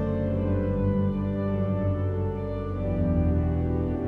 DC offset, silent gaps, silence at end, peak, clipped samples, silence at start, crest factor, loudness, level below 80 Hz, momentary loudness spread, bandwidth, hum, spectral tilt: under 0.1%; none; 0 s; -14 dBFS; under 0.1%; 0 s; 12 dB; -27 LUFS; -36 dBFS; 5 LU; 4 kHz; none; -11.5 dB/octave